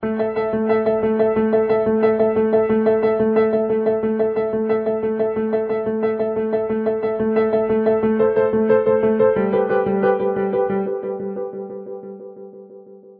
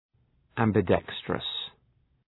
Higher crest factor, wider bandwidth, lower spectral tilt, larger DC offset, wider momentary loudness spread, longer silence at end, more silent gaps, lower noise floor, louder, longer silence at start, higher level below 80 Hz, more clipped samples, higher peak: second, 14 dB vs 24 dB; about the same, 4.3 kHz vs 4.1 kHz; first, -11.5 dB/octave vs -9 dB/octave; neither; second, 10 LU vs 13 LU; second, 0.05 s vs 0.6 s; neither; second, -42 dBFS vs -68 dBFS; first, -19 LUFS vs -28 LUFS; second, 0 s vs 0.55 s; about the same, -54 dBFS vs -56 dBFS; neither; about the same, -4 dBFS vs -6 dBFS